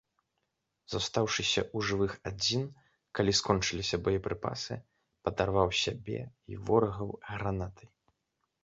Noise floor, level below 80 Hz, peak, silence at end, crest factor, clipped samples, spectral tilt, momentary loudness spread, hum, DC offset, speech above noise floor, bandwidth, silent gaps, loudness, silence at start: -82 dBFS; -52 dBFS; -10 dBFS; 0.8 s; 24 dB; under 0.1%; -4 dB/octave; 12 LU; none; under 0.1%; 50 dB; 8 kHz; none; -32 LUFS; 0.9 s